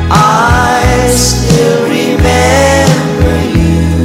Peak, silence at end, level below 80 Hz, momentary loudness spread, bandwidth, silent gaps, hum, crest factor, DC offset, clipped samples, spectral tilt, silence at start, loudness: 0 dBFS; 0 s; -18 dBFS; 4 LU; 16.5 kHz; none; none; 8 dB; under 0.1%; under 0.1%; -5 dB/octave; 0 s; -8 LUFS